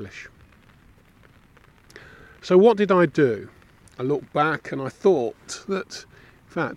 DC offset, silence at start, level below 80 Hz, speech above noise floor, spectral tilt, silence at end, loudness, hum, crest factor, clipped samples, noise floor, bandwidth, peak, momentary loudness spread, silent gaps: under 0.1%; 0 s; -60 dBFS; 33 dB; -6.5 dB/octave; 0 s; -22 LUFS; none; 20 dB; under 0.1%; -54 dBFS; 11 kHz; -4 dBFS; 21 LU; none